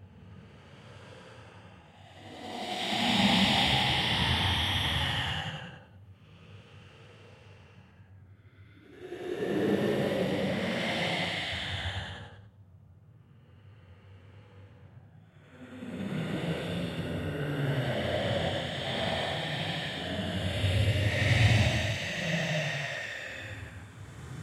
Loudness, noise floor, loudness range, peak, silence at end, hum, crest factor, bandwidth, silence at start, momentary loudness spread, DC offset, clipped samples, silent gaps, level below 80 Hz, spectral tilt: -29 LUFS; -56 dBFS; 14 LU; -12 dBFS; 0 s; none; 20 dB; 15.5 kHz; 0 s; 25 LU; under 0.1%; under 0.1%; none; -50 dBFS; -5 dB/octave